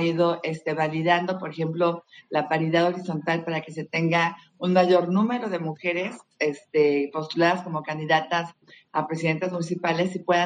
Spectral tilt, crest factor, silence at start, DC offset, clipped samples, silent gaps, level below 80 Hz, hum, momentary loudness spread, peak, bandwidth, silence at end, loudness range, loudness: -6.5 dB/octave; 18 dB; 0 s; under 0.1%; under 0.1%; none; -72 dBFS; none; 8 LU; -6 dBFS; 9.6 kHz; 0 s; 2 LU; -25 LUFS